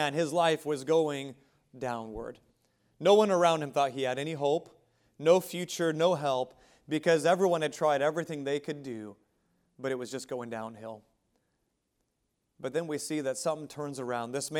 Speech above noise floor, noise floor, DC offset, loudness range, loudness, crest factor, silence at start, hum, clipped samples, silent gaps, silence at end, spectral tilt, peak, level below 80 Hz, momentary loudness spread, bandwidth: 50 dB; -79 dBFS; under 0.1%; 12 LU; -30 LUFS; 22 dB; 0 s; none; under 0.1%; none; 0 s; -4.5 dB/octave; -10 dBFS; -68 dBFS; 16 LU; 17 kHz